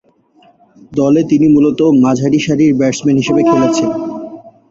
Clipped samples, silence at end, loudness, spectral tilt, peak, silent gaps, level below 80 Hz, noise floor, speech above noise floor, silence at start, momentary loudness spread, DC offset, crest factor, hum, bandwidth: under 0.1%; 0.2 s; -12 LUFS; -6.5 dB/octave; -2 dBFS; none; -50 dBFS; -49 dBFS; 38 dB; 0.9 s; 12 LU; under 0.1%; 12 dB; none; 7.8 kHz